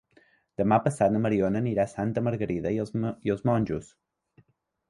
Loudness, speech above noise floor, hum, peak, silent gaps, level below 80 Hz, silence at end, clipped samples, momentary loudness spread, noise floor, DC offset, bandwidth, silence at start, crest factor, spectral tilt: -27 LUFS; 39 dB; none; -8 dBFS; none; -54 dBFS; 1.05 s; under 0.1%; 7 LU; -65 dBFS; under 0.1%; 11.5 kHz; 0.6 s; 20 dB; -8 dB/octave